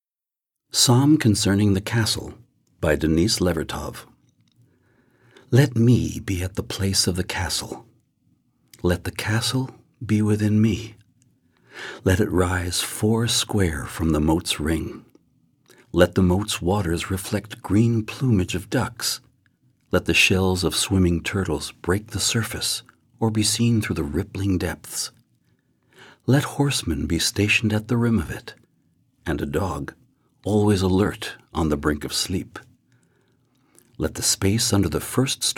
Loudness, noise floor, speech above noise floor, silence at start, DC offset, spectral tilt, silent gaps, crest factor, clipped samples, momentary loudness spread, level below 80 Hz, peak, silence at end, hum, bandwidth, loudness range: -22 LUFS; under -90 dBFS; over 69 dB; 0.75 s; under 0.1%; -4.5 dB/octave; none; 22 dB; under 0.1%; 12 LU; -42 dBFS; -2 dBFS; 0.05 s; none; 17.5 kHz; 4 LU